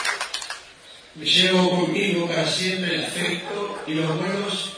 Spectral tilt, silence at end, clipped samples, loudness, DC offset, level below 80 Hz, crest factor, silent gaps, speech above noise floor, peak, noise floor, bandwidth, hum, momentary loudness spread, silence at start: -4 dB/octave; 0 s; under 0.1%; -22 LUFS; under 0.1%; -66 dBFS; 18 dB; none; 23 dB; -6 dBFS; -46 dBFS; 11 kHz; none; 12 LU; 0 s